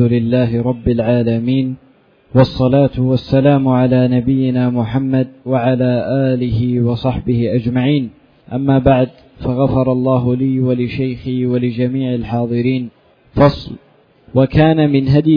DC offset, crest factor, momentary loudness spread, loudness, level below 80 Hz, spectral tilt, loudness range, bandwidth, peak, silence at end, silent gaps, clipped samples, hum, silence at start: under 0.1%; 14 dB; 8 LU; -15 LUFS; -36 dBFS; -10.5 dB/octave; 3 LU; 5.2 kHz; 0 dBFS; 0 s; none; under 0.1%; none; 0 s